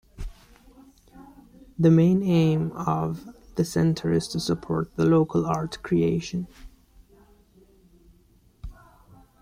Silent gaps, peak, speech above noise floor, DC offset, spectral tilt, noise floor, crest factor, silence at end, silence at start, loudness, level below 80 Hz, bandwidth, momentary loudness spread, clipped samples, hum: none; -8 dBFS; 36 dB; under 0.1%; -7.5 dB/octave; -59 dBFS; 18 dB; 0.7 s; 0.2 s; -24 LUFS; -48 dBFS; 14 kHz; 23 LU; under 0.1%; none